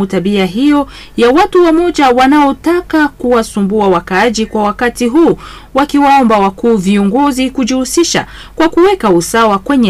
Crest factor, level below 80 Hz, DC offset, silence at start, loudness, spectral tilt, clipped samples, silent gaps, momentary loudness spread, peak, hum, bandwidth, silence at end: 8 dB; -36 dBFS; under 0.1%; 0 s; -10 LUFS; -5 dB/octave; under 0.1%; none; 6 LU; -2 dBFS; none; 15.5 kHz; 0 s